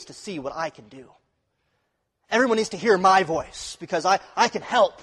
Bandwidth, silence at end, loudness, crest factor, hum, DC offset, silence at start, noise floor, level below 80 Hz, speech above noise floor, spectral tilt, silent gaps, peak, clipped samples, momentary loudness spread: 12 kHz; 0.1 s; -22 LUFS; 18 dB; none; under 0.1%; 0 s; -74 dBFS; -60 dBFS; 51 dB; -3.5 dB/octave; none; -6 dBFS; under 0.1%; 15 LU